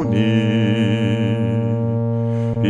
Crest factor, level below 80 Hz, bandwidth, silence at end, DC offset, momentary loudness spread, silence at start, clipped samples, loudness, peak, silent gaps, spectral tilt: 12 dB; -52 dBFS; 7.6 kHz; 0 s; under 0.1%; 4 LU; 0 s; under 0.1%; -19 LUFS; -6 dBFS; none; -8.5 dB/octave